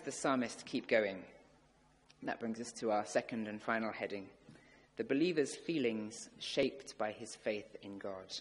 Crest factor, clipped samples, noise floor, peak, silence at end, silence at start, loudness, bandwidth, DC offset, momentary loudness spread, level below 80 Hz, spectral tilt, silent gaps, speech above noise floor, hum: 22 dB; under 0.1%; -69 dBFS; -18 dBFS; 0 s; 0 s; -38 LUFS; 11.5 kHz; under 0.1%; 13 LU; -76 dBFS; -4 dB/octave; none; 31 dB; none